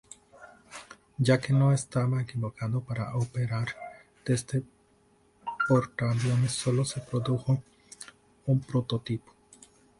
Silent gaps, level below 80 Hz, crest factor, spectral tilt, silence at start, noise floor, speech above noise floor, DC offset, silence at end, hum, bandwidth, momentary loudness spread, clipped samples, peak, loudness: none; -60 dBFS; 20 dB; -6 dB/octave; 0.4 s; -64 dBFS; 37 dB; under 0.1%; 0.8 s; none; 11.5 kHz; 20 LU; under 0.1%; -10 dBFS; -29 LUFS